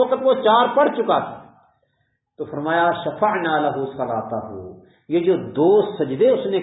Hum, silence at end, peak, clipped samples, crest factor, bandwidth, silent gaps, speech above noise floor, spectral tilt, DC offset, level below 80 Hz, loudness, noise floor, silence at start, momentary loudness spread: none; 0 s; -2 dBFS; under 0.1%; 18 dB; 4 kHz; none; 51 dB; -10.5 dB/octave; under 0.1%; -60 dBFS; -19 LUFS; -70 dBFS; 0 s; 15 LU